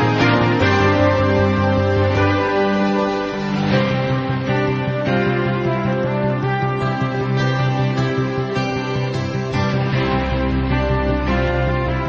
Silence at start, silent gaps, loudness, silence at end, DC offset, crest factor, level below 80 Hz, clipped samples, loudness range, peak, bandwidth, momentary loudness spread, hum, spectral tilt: 0 s; none; -18 LUFS; 0 s; under 0.1%; 14 dB; -30 dBFS; under 0.1%; 3 LU; -4 dBFS; 7.4 kHz; 6 LU; none; -7.5 dB/octave